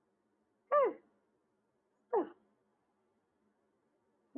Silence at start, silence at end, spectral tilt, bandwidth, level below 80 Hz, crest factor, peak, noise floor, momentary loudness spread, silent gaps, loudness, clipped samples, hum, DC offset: 0.7 s; 2.1 s; 2 dB/octave; 3.2 kHz; under -90 dBFS; 20 dB; -20 dBFS; -80 dBFS; 14 LU; none; -35 LUFS; under 0.1%; none; under 0.1%